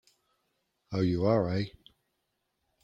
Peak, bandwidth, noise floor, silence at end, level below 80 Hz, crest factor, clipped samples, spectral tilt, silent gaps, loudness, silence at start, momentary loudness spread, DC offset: -12 dBFS; 7.4 kHz; -80 dBFS; 1.15 s; -60 dBFS; 20 dB; under 0.1%; -8.5 dB/octave; none; -30 LUFS; 0.9 s; 11 LU; under 0.1%